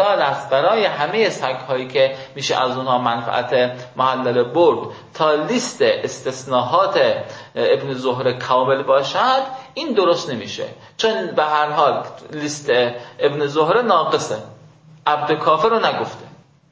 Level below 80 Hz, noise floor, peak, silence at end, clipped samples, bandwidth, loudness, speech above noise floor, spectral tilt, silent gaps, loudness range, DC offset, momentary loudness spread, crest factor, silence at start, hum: -64 dBFS; -46 dBFS; -2 dBFS; 0.45 s; under 0.1%; 8 kHz; -18 LUFS; 27 dB; -4 dB/octave; none; 2 LU; under 0.1%; 10 LU; 16 dB; 0 s; none